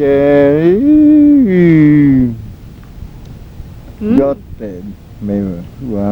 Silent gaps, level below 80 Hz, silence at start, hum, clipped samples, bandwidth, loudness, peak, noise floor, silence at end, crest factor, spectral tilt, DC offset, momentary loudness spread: none; -34 dBFS; 0 s; none; under 0.1%; 4.3 kHz; -9 LUFS; 0 dBFS; -32 dBFS; 0 s; 10 dB; -10 dB/octave; under 0.1%; 19 LU